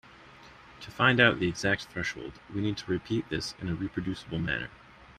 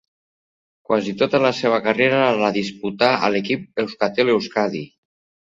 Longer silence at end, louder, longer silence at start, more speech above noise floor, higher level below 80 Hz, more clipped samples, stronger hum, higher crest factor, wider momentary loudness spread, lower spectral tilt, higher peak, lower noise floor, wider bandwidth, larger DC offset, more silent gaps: second, 0.05 s vs 0.55 s; second, -29 LUFS vs -19 LUFS; second, 0.05 s vs 0.9 s; second, 23 dB vs over 71 dB; first, -54 dBFS vs -62 dBFS; neither; neither; about the same, 24 dB vs 20 dB; first, 15 LU vs 8 LU; about the same, -5 dB/octave vs -5.5 dB/octave; second, -6 dBFS vs 0 dBFS; second, -52 dBFS vs under -90 dBFS; first, 14 kHz vs 7.8 kHz; neither; neither